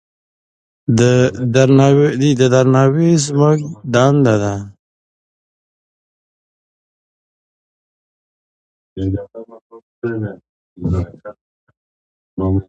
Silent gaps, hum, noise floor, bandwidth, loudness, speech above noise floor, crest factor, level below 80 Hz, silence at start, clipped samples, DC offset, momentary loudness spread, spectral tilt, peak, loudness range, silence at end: 4.79-8.96 s, 9.61-9.70 s, 9.83-10.02 s, 10.49-10.76 s, 11.41-11.67 s, 11.77-12.37 s; none; under -90 dBFS; 9.4 kHz; -14 LUFS; over 77 dB; 16 dB; -40 dBFS; 0.9 s; under 0.1%; under 0.1%; 16 LU; -6.5 dB/octave; 0 dBFS; 18 LU; 0.05 s